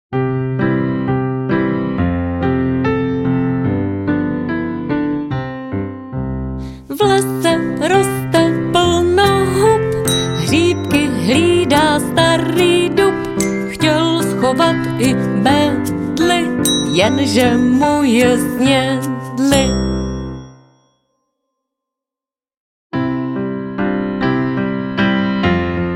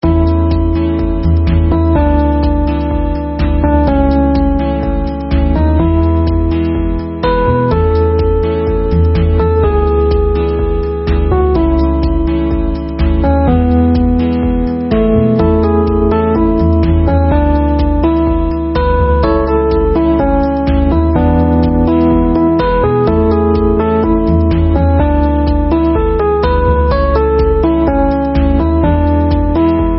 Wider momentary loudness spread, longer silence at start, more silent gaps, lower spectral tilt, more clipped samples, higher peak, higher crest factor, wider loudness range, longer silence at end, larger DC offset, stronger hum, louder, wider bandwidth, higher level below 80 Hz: first, 9 LU vs 4 LU; about the same, 0.1 s vs 0 s; first, 22.57-22.90 s vs none; second, -5 dB/octave vs -13.5 dB/octave; neither; about the same, 0 dBFS vs 0 dBFS; about the same, 14 dB vs 10 dB; first, 7 LU vs 2 LU; about the same, 0 s vs 0 s; neither; neither; second, -15 LUFS vs -12 LUFS; first, 16.5 kHz vs 5.6 kHz; second, -36 dBFS vs -16 dBFS